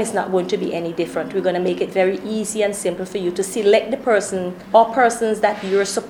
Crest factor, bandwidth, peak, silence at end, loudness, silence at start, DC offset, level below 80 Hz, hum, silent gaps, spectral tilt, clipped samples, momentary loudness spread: 18 dB; 18 kHz; -2 dBFS; 0 s; -19 LUFS; 0 s; under 0.1%; -58 dBFS; none; none; -4 dB/octave; under 0.1%; 8 LU